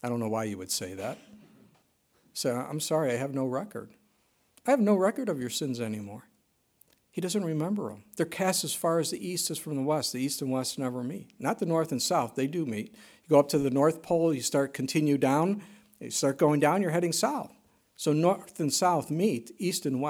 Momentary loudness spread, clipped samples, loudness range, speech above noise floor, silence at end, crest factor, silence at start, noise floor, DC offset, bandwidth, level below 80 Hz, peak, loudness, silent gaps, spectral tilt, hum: 12 LU; under 0.1%; 6 LU; 43 dB; 0 s; 20 dB; 0.05 s; -71 dBFS; under 0.1%; 18 kHz; -72 dBFS; -8 dBFS; -29 LUFS; none; -4.5 dB/octave; none